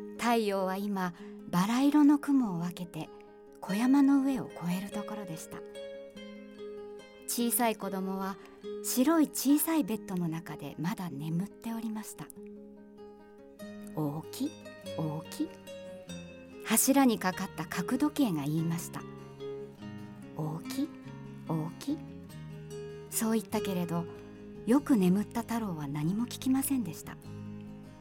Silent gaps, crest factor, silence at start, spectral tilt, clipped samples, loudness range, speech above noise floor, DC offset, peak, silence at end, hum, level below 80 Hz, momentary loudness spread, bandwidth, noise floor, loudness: none; 20 dB; 0 s; -5 dB/octave; under 0.1%; 10 LU; 22 dB; under 0.1%; -12 dBFS; 0 s; none; -64 dBFS; 20 LU; 17 kHz; -53 dBFS; -31 LUFS